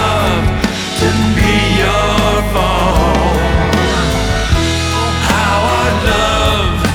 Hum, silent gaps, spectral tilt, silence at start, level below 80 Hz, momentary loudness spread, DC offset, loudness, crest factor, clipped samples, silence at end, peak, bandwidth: none; none; -5 dB/octave; 0 s; -20 dBFS; 3 LU; under 0.1%; -13 LUFS; 12 dB; under 0.1%; 0 s; 0 dBFS; 18.5 kHz